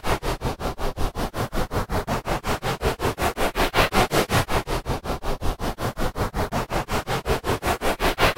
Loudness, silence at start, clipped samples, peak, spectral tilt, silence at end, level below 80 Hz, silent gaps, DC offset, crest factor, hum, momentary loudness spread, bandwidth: -25 LUFS; 0.05 s; under 0.1%; -4 dBFS; -4.5 dB/octave; 0.05 s; -30 dBFS; none; under 0.1%; 20 dB; none; 8 LU; 16 kHz